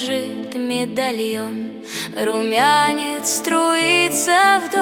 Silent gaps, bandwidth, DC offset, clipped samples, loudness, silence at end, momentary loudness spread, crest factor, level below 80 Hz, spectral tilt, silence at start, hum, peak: none; over 20 kHz; under 0.1%; under 0.1%; -18 LUFS; 0 s; 13 LU; 16 dB; -64 dBFS; -2 dB/octave; 0 s; none; -2 dBFS